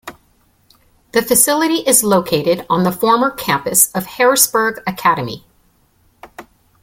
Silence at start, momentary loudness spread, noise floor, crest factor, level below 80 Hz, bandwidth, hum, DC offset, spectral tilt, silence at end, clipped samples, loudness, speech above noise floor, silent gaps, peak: 0.05 s; 8 LU; -56 dBFS; 16 dB; -52 dBFS; 17 kHz; none; under 0.1%; -3 dB/octave; 0.4 s; under 0.1%; -14 LUFS; 42 dB; none; 0 dBFS